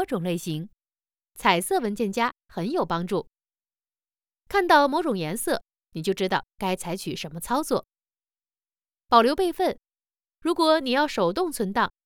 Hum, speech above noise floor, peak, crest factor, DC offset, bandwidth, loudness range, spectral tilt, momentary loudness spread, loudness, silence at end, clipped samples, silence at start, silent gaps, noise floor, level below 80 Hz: none; over 66 dB; -4 dBFS; 22 dB; under 0.1%; 19 kHz; 5 LU; -4.5 dB/octave; 12 LU; -25 LUFS; 0.15 s; under 0.1%; 0 s; none; under -90 dBFS; -56 dBFS